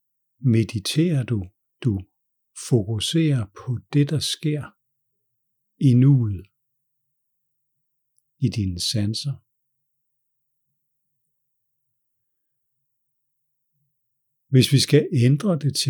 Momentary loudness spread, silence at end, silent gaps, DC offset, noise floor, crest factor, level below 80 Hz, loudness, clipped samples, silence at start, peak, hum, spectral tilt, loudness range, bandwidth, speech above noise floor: 14 LU; 0 s; none; under 0.1%; -76 dBFS; 20 dB; -58 dBFS; -22 LUFS; under 0.1%; 0.4 s; -4 dBFS; none; -6 dB/octave; 6 LU; 18 kHz; 55 dB